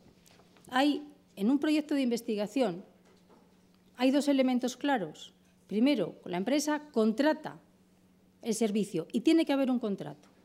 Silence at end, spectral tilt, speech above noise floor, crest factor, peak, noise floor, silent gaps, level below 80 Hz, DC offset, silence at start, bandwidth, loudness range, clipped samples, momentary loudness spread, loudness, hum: 0.3 s; -5 dB/octave; 34 dB; 16 dB; -14 dBFS; -64 dBFS; none; -80 dBFS; under 0.1%; 0.65 s; 15.5 kHz; 2 LU; under 0.1%; 13 LU; -30 LUFS; none